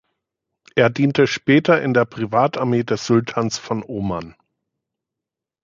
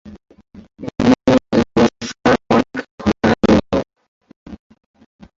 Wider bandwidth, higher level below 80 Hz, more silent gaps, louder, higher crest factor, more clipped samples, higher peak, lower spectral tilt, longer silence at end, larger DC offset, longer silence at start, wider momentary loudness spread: about the same, 7.6 kHz vs 7.8 kHz; second, -54 dBFS vs -38 dBFS; second, none vs 2.91-2.98 s, 4.08-4.21 s, 4.36-4.46 s; second, -19 LUFS vs -16 LUFS; about the same, 18 dB vs 16 dB; neither; about the same, -2 dBFS vs -2 dBFS; about the same, -6 dB/octave vs -6 dB/octave; first, 1.35 s vs 0.85 s; neither; first, 0.75 s vs 0.05 s; about the same, 10 LU vs 11 LU